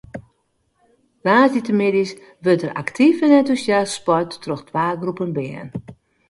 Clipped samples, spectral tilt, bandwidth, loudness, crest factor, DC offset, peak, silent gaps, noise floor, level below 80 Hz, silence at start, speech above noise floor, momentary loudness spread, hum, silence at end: under 0.1%; -6 dB/octave; 11.5 kHz; -19 LUFS; 18 dB; under 0.1%; -2 dBFS; none; -67 dBFS; -58 dBFS; 0.15 s; 49 dB; 15 LU; none; 0.35 s